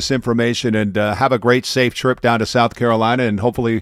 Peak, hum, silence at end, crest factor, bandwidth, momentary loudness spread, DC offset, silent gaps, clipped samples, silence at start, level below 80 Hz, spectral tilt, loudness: 0 dBFS; none; 0 s; 16 dB; 15 kHz; 3 LU; under 0.1%; none; under 0.1%; 0 s; -46 dBFS; -5.5 dB/octave; -16 LUFS